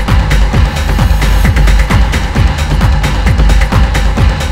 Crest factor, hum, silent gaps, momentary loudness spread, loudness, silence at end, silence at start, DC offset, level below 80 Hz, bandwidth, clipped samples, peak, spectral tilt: 8 dB; none; none; 2 LU; -11 LUFS; 0 s; 0 s; under 0.1%; -10 dBFS; 15.5 kHz; 1%; 0 dBFS; -5.5 dB/octave